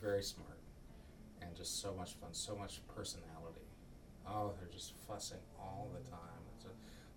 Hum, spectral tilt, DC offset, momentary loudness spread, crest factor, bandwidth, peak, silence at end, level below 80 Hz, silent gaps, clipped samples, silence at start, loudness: none; -3.5 dB/octave; under 0.1%; 16 LU; 20 dB; 19 kHz; -28 dBFS; 0 s; -62 dBFS; none; under 0.1%; 0 s; -48 LUFS